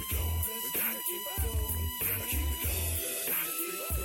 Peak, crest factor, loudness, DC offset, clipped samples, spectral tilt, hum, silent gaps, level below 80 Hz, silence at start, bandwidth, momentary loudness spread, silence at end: -20 dBFS; 14 dB; -31 LUFS; under 0.1%; under 0.1%; -3 dB/octave; none; none; -38 dBFS; 0 s; 17 kHz; 3 LU; 0 s